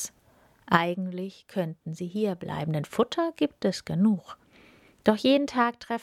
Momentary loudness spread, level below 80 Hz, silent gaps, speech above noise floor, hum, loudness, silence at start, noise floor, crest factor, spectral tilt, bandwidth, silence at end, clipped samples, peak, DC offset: 11 LU; -64 dBFS; none; 34 dB; none; -27 LUFS; 0 s; -61 dBFS; 24 dB; -5.5 dB/octave; 15 kHz; 0 s; under 0.1%; -2 dBFS; under 0.1%